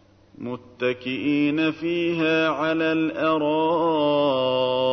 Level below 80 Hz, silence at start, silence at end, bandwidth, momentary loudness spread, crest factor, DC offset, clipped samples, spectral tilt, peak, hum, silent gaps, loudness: -64 dBFS; 0.4 s; 0 s; 6.4 kHz; 6 LU; 12 dB; under 0.1%; under 0.1%; -7 dB/octave; -10 dBFS; none; none; -22 LUFS